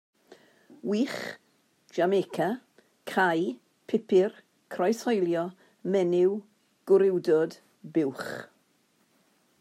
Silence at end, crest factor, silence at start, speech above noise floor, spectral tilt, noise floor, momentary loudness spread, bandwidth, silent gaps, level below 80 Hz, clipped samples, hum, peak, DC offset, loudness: 1.15 s; 18 dB; 0.3 s; 42 dB; -6 dB/octave; -68 dBFS; 16 LU; 14 kHz; none; -80 dBFS; under 0.1%; none; -10 dBFS; under 0.1%; -28 LUFS